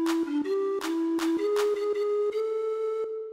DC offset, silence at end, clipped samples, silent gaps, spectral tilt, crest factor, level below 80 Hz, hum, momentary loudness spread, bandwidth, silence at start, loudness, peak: under 0.1%; 0 s; under 0.1%; none; -3 dB/octave; 12 dB; -72 dBFS; none; 4 LU; 16 kHz; 0 s; -28 LUFS; -16 dBFS